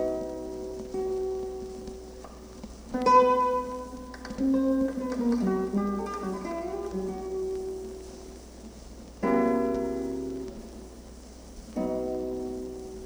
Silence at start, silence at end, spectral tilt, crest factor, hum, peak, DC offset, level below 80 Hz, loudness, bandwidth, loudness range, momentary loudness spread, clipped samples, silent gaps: 0 s; 0 s; -6.5 dB/octave; 22 dB; none; -8 dBFS; under 0.1%; -48 dBFS; -29 LUFS; over 20 kHz; 8 LU; 20 LU; under 0.1%; none